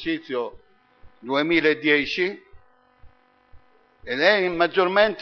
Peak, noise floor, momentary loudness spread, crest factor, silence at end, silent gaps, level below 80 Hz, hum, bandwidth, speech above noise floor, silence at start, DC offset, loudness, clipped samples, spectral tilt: -4 dBFS; -51 dBFS; 12 LU; 20 dB; 0 s; none; -58 dBFS; none; 6.8 kHz; 29 dB; 0 s; under 0.1%; -21 LUFS; under 0.1%; -5.5 dB/octave